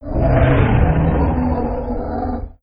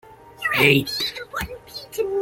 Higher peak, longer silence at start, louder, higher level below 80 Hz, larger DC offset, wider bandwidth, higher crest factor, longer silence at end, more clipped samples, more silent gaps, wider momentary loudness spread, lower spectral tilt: about the same, -2 dBFS vs 0 dBFS; about the same, 0 s vs 0.05 s; first, -17 LUFS vs -21 LUFS; first, -22 dBFS vs -48 dBFS; neither; second, 5 kHz vs 17 kHz; second, 14 dB vs 22 dB; about the same, 0.1 s vs 0 s; neither; neither; second, 10 LU vs 17 LU; first, -12.5 dB/octave vs -4.5 dB/octave